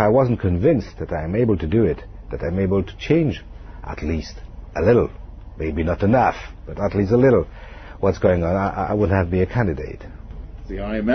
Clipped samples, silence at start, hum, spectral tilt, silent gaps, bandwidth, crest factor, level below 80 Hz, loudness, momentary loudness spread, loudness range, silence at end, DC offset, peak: under 0.1%; 0 s; none; -8.5 dB/octave; none; 6.4 kHz; 16 dB; -34 dBFS; -20 LUFS; 20 LU; 3 LU; 0 s; under 0.1%; -4 dBFS